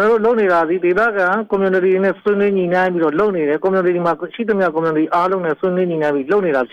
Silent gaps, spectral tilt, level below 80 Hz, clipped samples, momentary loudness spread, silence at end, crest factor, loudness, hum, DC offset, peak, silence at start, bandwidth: none; -8 dB/octave; -56 dBFS; under 0.1%; 4 LU; 0.05 s; 8 dB; -16 LUFS; none; under 0.1%; -6 dBFS; 0 s; 7 kHz